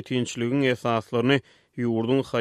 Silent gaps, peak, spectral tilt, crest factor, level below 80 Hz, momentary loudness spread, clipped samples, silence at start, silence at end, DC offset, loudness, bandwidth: none; -8 dBFS; -6 dB/octave; 18 dB; -64 dBFS; 5 LU; under 0.1%; 0 s; 0 s; under 0.1%; -25 LUFS; 12.5 kHz